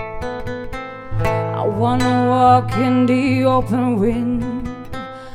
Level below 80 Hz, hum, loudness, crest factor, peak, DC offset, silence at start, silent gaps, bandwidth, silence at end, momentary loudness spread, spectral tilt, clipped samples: -36 dBFS; none; -18 LUFS; 16 dB; -2 dBFS; under 0.1%; 0 s; none; 13 kHz; 0 s; 15 LU; -7.5 dB/octave; under 0.1%